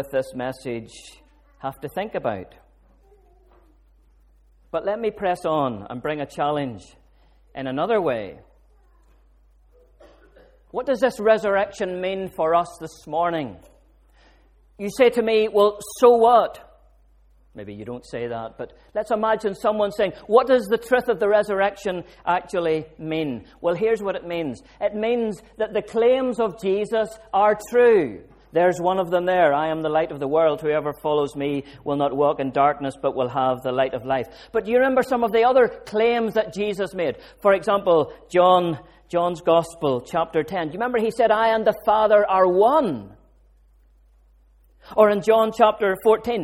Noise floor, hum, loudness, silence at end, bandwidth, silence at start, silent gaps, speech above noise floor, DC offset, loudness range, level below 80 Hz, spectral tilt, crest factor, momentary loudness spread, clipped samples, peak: -56 dBFS; none; -21 LUFS; 0 s; 16 kHz; 0 s; none; 35 dB; under 0.1%; 9 LU; -54 dBFS; -5.5 dB/octave; 22 dB; 13 LU; under 0.1%; 0 dBFS